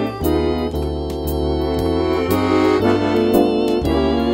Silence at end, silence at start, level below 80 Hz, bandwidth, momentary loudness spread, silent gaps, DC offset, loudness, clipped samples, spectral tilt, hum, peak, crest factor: 0 s; 0 s; -30 dBFS; 16.5 kHz; 7 LU; none; under 0.1%; -18 LUFS; under 0.1%; -7 dB/octave; none; -2 dBFS; 14 dB